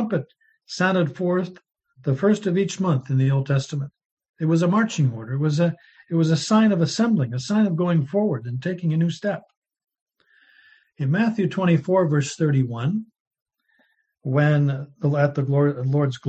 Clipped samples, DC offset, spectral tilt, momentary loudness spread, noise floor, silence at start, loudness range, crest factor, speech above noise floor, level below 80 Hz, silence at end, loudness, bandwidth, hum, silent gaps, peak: under 0.1%; under 0.1%; -7 dB/octave; 9 LU; -66 dBFS; 0 s; 4 LU; 16 dB; 45 dB; -64 dBFS; 0 s; -22 LUFS; 8.6 kHz; none; 4.05-4.17 s, 4.29-4.34 s, 9.57-9.62 s, 10.02-10.06 s, 13.20-13.31 s, 13.42-13.46 s; -6 dBFS